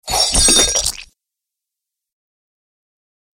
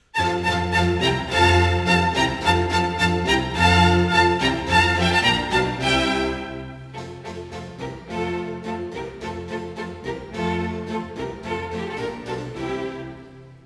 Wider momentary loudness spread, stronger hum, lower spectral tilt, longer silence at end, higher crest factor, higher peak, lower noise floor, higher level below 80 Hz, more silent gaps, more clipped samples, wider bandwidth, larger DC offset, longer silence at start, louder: second, 13 LU vs 17 LU; neither; second, -0.5 dB/octave vs -5 dB/octave; first, 2.3 s vs 0.05 s; about the same, 20 dB vs 18 dB; first, 0 dBFS vs -4 dBFS; first, -83 dBFS vs -43 dBFS; first, -32 dBFS vs -38 dBFS; neither; neither; first, 17 kHz vs 11 kHz; neither; about the same, 0.05 s vs 0.15 s; first, -12 LUFS vs -21 LUFS